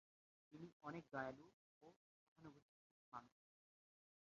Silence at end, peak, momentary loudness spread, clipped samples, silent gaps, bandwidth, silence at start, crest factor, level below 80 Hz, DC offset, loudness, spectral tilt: 0.95 s; -34 dBFS; 15 LU; under 0.1%; 0.73-0.80 s, 1.53-1.81 s, 1.96-2.36 s, 2.62-3.12 s; 7.2 kHz; 0.5 s; 26 dB; -88 dBFS; under 0.1%; -56 LUFS; -5 dB/octave